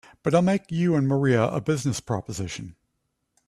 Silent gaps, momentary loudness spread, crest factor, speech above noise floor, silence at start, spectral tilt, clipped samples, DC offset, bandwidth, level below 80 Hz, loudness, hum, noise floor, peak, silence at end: none; 12 LU; 18 dB; 53 dB; 0.25 s; -6.5 dB/octave; under 0.1%; under 0.1%; 13 kHz; -56 dBFS; -24 LUFS; none; -76 dBFS; -6 dBFS; 0.75 s